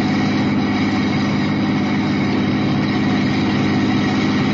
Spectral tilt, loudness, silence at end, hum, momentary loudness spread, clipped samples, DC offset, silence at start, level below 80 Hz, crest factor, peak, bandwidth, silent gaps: -6.5 dB/octave; -18 LUFS; 0 s; none; 1 LU; under 0.1%; under 0.1%; 0 s; -44 dBFS; 10 dB; -6 dBFS; 7.6 kHz; none